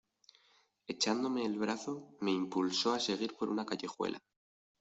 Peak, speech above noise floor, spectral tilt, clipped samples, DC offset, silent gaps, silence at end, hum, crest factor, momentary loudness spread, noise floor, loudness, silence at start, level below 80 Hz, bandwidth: -16 dBFS; 35 dB; -3.5 dB/octave; under 0.1%; under 0.1%; none; 0.6 s; none; 20 dB; 9 LU; -71 dBFS; -35 LUFS; 0.9 s; -80 dBFS; 8.2 kHz